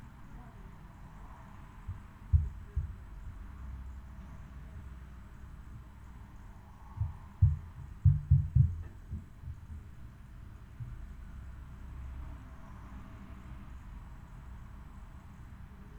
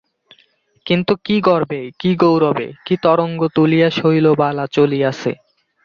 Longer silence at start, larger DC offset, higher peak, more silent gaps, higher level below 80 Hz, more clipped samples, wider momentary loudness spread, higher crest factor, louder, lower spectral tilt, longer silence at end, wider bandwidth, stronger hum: second, 0 s vs 0.85 s; neither; second, -14 dBFS vs -2 dBFS; neither; first, -44 dBFS vs -56 dBFS; neither; first, 22 LU vs 10 LU; first, 24 dB vs 14 dB; second, -35 LUFS vs -16 LUFS; first, -9 dB/octave vs -7.5 dB/octave; second, 0 s vs 0.5 s; about the same, 7.8 kHz vs 7.2 kHz; neither